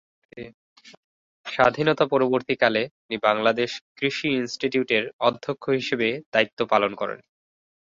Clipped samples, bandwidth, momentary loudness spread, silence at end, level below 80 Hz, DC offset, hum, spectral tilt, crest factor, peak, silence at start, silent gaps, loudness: under 0.1%; 7.8 kHz; 12 LU; 0.65 s; -64 dBFS; under 0.1%; none; -5 dB/octave; 22 dB; -2 dBFS; 0.35 s; 0.54-0.76 s, 0.97-1.44 s, 2.91-3.09 s, 3.81-3.96 s, 5.13-5.19 s, 6.26-6.32 s, 6.53-6.57 s; -23 LUFS